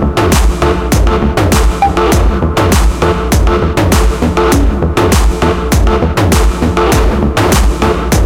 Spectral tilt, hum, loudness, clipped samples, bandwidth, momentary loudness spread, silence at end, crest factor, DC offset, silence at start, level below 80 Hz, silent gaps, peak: -5.5 dB/octave; none; -11 LUFS; under 0.1%; 17 kHz; 2 LU; 0 s; 8 dB; under 0.1%; 0 s; -12 dBFS; none; 0 dBFS